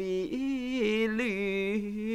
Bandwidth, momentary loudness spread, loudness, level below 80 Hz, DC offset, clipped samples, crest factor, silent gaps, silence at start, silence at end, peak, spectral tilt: 13 kHz; 4 LU; -30 LUFS; -56 dBFS; under 0.1%; under 0.1%; 12 dB; none; 0 s; 0 s; -18 dBFS; -6 dB/octave